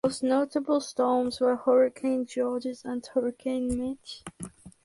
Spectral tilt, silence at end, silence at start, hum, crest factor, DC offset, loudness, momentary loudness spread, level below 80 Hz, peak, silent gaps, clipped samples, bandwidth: -5 dB/octave; 0.15 s; 0.05 s; none; 16 dB; under 0.1%; -27 LUFS; 17 LU; -56 dBFS; -12 dBFS; none; under 0.1%; 11.5 kHz